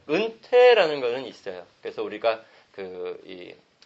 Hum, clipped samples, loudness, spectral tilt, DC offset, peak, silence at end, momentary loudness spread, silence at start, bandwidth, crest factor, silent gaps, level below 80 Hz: none; under 0.1%; -22 LUFS; -4.5 dB/octave; under 0.1%; -6 dBFS; 0.35 s; 23 LU; 0.1 s; 7.6 kHz; 18 dB; none; -74 dBFS